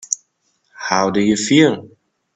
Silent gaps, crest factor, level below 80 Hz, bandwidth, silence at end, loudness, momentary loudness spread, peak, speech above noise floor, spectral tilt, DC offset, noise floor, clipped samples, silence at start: none; 18 dB; -56 dBFS; 9.2 kHz; 0.5 s; -16 LUFS; 14 LU; 0 dBFS; 51 dB; -4 dB/octave; under 0.1%; -66 dBFS; under 0.1%; 0.1 s